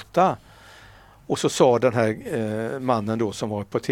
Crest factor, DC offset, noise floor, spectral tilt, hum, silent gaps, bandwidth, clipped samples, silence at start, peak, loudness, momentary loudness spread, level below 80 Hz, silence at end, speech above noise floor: 20 dB; under 0.1%; -49 dBFS; -5.5 dB/octave; none; none; 16.5 kHz; under 0.1%; 0 s; -4 dBFS; -23 LUFS; 9 LU; -58 dBFS; 0 s; 27 dB